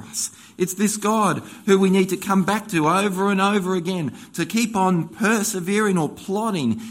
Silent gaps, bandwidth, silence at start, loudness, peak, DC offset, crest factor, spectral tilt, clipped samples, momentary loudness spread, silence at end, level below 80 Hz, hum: none; 16.5 kHz; 0 s; -21 LUFS; -2 dBFS; under 0.1%; 18 dB; -5 dB/octave; under 0.1%; 8 LU; 0 s; -62 dBFS; none